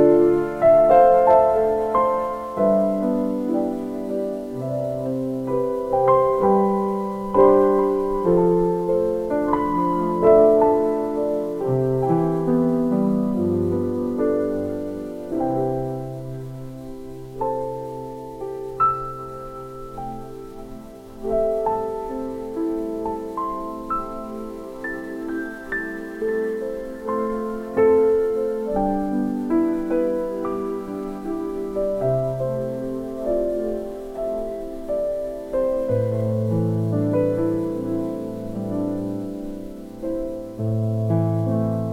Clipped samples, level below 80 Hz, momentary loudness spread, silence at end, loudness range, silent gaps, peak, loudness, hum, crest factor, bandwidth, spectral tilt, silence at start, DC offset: under 0.1%; -44 dBFS; 15 LU; 0 s; 9 LU; none; -2 dBFS; -22 LUFS; none; 18 dB; 16 kHz; -9 dB/octave; 0 s; under 0.1%